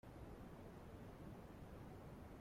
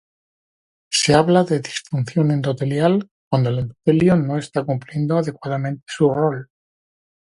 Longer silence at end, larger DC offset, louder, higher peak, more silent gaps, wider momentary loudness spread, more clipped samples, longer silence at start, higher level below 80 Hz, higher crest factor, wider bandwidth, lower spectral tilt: second, 0 s vs 0.9 s; neither; second, -58 LUFS vs -19 LUFS; second, -44 dBFS vs 0 dBFS; second, none vs 3.11-3.31 s; second, 1 LU vs 9 LU; neither; second, 0.05 s vs 0.9 s; second, -64 dBFS vs -54 dBFS; second, 12 dB vs 20 dB; first, 16.5 kHz vs 11.5 kHz; about the same, -7 dB/octave vs -6 dB/octave